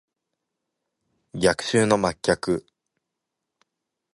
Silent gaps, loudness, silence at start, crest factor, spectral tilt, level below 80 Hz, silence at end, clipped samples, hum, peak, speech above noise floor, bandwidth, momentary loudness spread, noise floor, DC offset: none; -23 LUFS; 1.35 s; 24 dB; -4.5 dB/octave; -54 dBFS; 1.55 s; under 0.1%; none; -4 dBFS; 61 dB; 11.5 kHz; 8 LU; -83 dBFS; under 0.1%